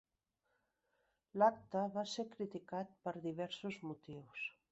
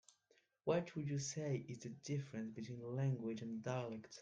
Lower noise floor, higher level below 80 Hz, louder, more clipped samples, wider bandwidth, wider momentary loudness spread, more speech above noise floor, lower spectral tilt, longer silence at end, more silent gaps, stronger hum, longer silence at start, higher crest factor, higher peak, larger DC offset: first, -86 dBFS vs -78 dBFS; about the same, -82 dBFS vs -80 dBFS; first, -41 LUFS vs -44 LUFS; neither; second, 8 kHz vs 9.2 kHz; first, 15 LU vs 8 LU; first, 45 dB vs 35 dB; second, -4 dB/octave vs -6 dB/octave; first, 0.2 s vs 0 s; neither; neither; first, 1.35 s vs 0.65 s; about the same, 24 dB vs 20 dB; first, -20 dBFS vs -24 dBFS; neither